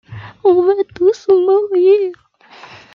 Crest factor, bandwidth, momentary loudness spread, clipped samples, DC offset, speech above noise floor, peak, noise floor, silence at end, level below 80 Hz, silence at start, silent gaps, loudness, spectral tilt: 12 dB; 6.8 kHz; 5 LU; under 0.1%; under 0.1%; 29 dB; -2 dBFS; -41 dBFS; 0.8 s; -58 dBFS; 0.1 s; none; -13 LUFS; -7 dB/octave